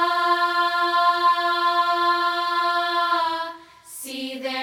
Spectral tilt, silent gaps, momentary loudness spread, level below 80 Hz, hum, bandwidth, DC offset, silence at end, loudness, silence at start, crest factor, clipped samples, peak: -1 dB/octave; none; 12 LU; -74 dBFS; none; 17.5 kHz; under 0.1%; 0 s; -21 LUFS; 0 s; 14 dB; under 0.1%; -8 dBFS